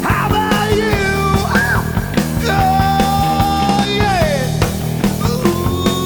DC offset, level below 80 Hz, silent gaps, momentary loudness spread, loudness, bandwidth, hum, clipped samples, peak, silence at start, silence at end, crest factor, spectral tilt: under 0.1%; -26 dBFS; none; 4 LU; -15 LUFS; over 20 kHz; none; under 0.1%; 0 dBFS; 0 s; 0 s; 14 dB; -5.5 dB/octave